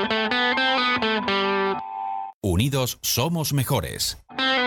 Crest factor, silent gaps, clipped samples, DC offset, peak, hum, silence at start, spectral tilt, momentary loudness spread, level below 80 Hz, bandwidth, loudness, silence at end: 16 dB; 2.34-2.41 s; under 0.1%; under 0.1%; -8 dBFS; none; 0 s; -3.5 dB/octave; 9 LU; -46 dBFS; 19 kHz; -23 LUFS; 0 s